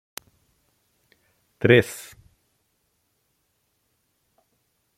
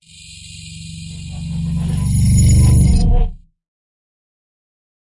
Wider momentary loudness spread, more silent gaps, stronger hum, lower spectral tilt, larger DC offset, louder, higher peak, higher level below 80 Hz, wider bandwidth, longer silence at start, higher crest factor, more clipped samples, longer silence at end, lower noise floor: first, 25 LU vs 22 LU; neither; neither; about the same, -5.5 dB/octave vs -6 dB/octave; neither; second, -20 LUFS vs -15 LUFS; about the same, -2 dBFS vs -4 dBFS; second, -62 dBFS vs -20 dBFS; first, 16 kHz vs 11.5 kHz; first, 1.65 s vs 0.3 s; first, 26 dB vs 12 dB; neither; first, 3 s vs 1.75 s; first, -72 dBFS vs -38 dBFS